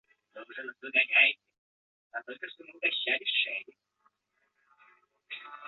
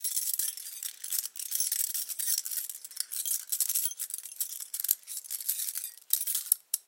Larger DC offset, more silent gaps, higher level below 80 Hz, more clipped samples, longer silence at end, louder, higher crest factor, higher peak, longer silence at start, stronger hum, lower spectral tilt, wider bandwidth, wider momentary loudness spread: neither; first, 1.58-2.10 s vs none; about the same, under -90 dBFS vs under -90 dBFS; neither; about the same, 0 s vs 0.05 s; first, -27 LUFS vs -30 LUFS; second, 24 dB vs 32 dB; second, -10 dBFS vs -2 dBFS; first, 0.35 s vs 0 s; neither; first, -3 dB/octave vs 7 dB/octave; second, 4.6 kHz vs 17 kHz; first, 21 LU vs 9 LU